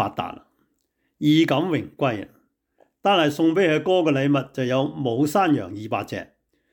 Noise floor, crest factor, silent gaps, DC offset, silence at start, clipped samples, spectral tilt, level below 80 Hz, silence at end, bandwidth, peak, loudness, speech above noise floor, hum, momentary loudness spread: -72 dBFS; 14 dB; none; under 0.1%; 0 s; under 0.1%; -6 dB/octave; -66 dBFS; 0.5 s; 19 kHz; -8 dBFS; -22 LUFS; 51 dB; none; 13 LU